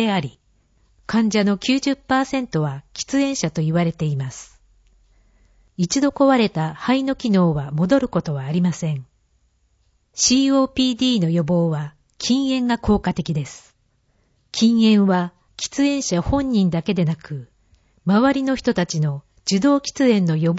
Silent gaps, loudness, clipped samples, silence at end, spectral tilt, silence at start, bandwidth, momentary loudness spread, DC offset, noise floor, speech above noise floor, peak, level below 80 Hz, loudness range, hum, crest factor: none; -20 LUFS; under 0.1%; 0 s; -5.5 dB/octave; 0 s; 8 kHz; 12 LU; under 0.1%; -63 dBFS; 45 dB; -4 dBFS; -44 dBFS; 3 LU; none; 16 dB